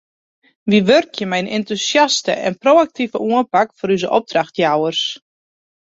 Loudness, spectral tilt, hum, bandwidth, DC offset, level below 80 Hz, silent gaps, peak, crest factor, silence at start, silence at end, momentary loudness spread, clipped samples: -16 LUFS; -4 dB/octave; none; 8 kHz; under 0.1%; -62 dBFS; none; 0 dBFS; 16 dB; 0.65 s; 0.8 s; 8 LU; under 0.1%